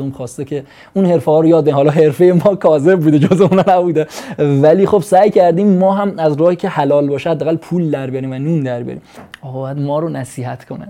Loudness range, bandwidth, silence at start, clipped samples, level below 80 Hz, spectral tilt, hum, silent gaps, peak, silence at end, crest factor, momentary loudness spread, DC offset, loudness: 8 LU; 15 kHz; 0 s; under 0.1%; -54 dBFS; -8 dB/octave; none; none; 0 dBFS; 0 s; 12 dB; 14 LU; under 0.1%; -13 LUFS